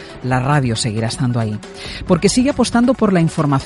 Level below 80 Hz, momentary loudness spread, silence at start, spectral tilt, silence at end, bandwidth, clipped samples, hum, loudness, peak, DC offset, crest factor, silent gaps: -38 dBFS; 9 LU; 0 s; -5.5 dB/octave; 0 s; 11.5 kHz; under 0.1%; none; -16 LUFS; 0 dBFS; under 0.1%; 16 dB; none